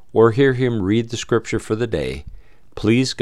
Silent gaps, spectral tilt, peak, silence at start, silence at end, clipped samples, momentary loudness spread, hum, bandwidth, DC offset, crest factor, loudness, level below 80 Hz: none; -6 dB/octave; -2 dBFS; 0.15 s; 0 s; under 0.1%; 9 LU; none; 12 kHz; 1%; 16 dB; -19 LUFS; -42 dBFS